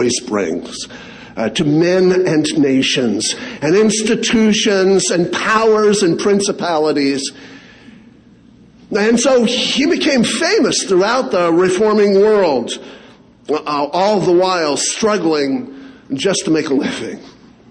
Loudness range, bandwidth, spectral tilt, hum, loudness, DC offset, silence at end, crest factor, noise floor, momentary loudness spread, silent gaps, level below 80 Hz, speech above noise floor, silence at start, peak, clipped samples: 4 LU; 10 kHz; -4 dB/octave; none; -14 LUFS; under 0.1%; 0.45 s; 14 dB; -45 dBFS; 10 LU; none; -52 dBFS; 30 dB; 0 s; -2 dBFS; under 0.1%